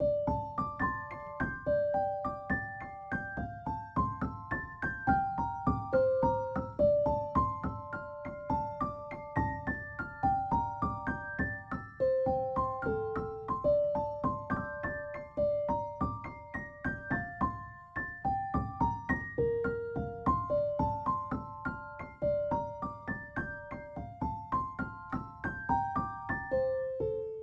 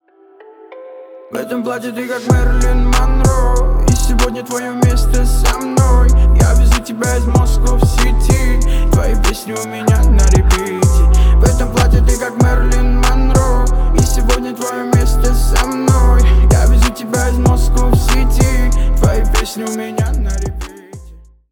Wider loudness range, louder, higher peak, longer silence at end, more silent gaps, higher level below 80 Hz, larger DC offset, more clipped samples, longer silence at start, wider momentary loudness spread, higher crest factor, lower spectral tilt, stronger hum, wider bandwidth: about the same, 5 LU vs 3 LU; second, -34 LUFS vs -14 LUFS; second, -16 dBFS vs 0 dBFS; second, 0 s vs 0.35 s; neither; second, -50 dBFS vs -12 dBFS; neither; neither; second, 0 s vs 0.7 s; about the same, 10 LU vs 9 LU; first, 18 dB vs 12 dB; first, -9.5 dB/octave vs -5.5 dB/octave; neither; second, 7 kHz vs 17 kHz